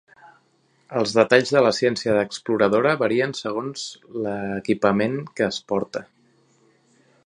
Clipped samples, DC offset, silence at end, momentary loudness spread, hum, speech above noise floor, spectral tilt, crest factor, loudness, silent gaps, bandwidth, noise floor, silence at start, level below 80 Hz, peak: under 0.1%; under 0.1%; 1.25 s; 13 LU; none; 42 dB; -5 dB/octave; 22 dB; -22 LUFS; none; 11 kHz; -63 dBFS; 0.9 s; -62 dBFS; 0 dBFS